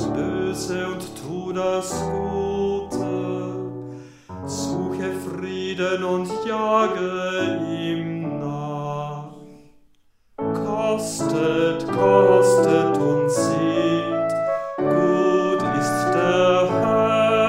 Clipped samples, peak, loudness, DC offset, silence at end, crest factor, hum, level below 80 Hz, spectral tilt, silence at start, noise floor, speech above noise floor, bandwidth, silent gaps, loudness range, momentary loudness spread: under 0.1%; -4 dBFS; -22 LUFS; under 0.1%; 0 s; 18 dB; none; -54 dBFS; -5.5 dB/octave; 0 s; -57 dBFS; 37 dB; 16 kHz; none; 9 LU; 12 LU